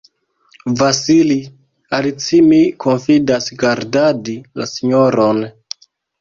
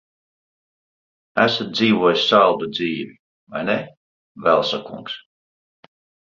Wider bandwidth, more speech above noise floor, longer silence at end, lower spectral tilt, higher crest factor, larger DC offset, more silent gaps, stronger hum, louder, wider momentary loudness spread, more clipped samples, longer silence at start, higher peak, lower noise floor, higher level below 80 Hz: about the same, 7.4 kHz vs 7.6 kHz; second, 40 dB vs over 71 dB; second, 0.7 s vs 1.15 s; about the same, -5 dB/octave vs -5 dB/octave; second, 14 dB vs 20 dB; neither; second, none vs 3.19-3.47 s, 3.97-4.35 s; neither; first, -14 LUFS vs -19 LUFS; second, 14 LU vs 18 LU; neither; second, 0.65 s vs 1.35 s; about the same, -2 dBFS vs -2 dBFS; second, -54 dBFS vs under -90 dBFS; first, -54 dBFS vs -62 dBFS